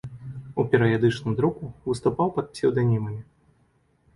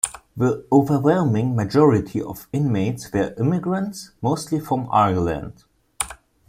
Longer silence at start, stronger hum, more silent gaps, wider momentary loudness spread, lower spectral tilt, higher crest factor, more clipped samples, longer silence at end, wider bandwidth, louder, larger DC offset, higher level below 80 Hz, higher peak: about the same, 0.05 s vs 0.05 s; neither; neither; about the same, 13 LU vs 12 LU; about the same, -7.5 dB/octave vs -6.5 dB/octave; about the same, 20 dB vs 20 dB; neither; first, 0.95 s vs 0.35 s; second, 11.5 kHz vs 16.5 kHz; second, -24 LUFS vs -21 LUFS; neither; about the same, -54 dBFS vs -50 dBFS; second, -4 dBFS vs 0 dBFS